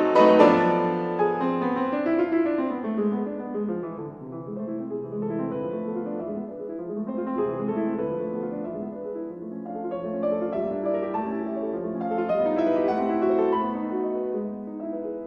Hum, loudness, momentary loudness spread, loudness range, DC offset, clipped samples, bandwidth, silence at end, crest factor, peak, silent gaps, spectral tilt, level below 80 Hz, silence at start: none; -26 LUFS; 11 LU; 6 LU; under 0.1%; under 0.1%; 7.4 kHz; 0 s; 22 dB; -2 dBFS; none; -8 dB/octave; -64 dBFS; 0 s